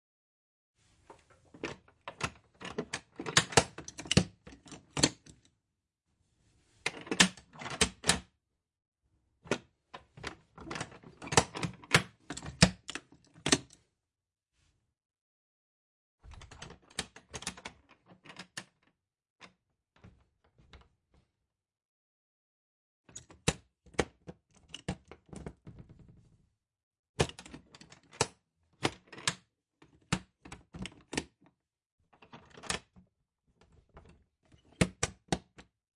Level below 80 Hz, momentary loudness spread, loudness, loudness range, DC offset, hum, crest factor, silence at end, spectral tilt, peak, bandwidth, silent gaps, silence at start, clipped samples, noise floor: -56 dBFS; 24 LU; -33 LUFS; 15 LU; under 0.1%; none; 32 dB; 0.35 s; -3 dB/octave; -8 dBFS; 11.5 kHz; 8.88-8.92 s, 15.21-16.18 s, 19.30-19.36 s, 21.85-23.04 s, 26.83-26.91 s, 26.99-27.03 s, 27.09-27.14 s, 31.92-31.98 s; 1.1 s; under 0.1%; -86 dBFS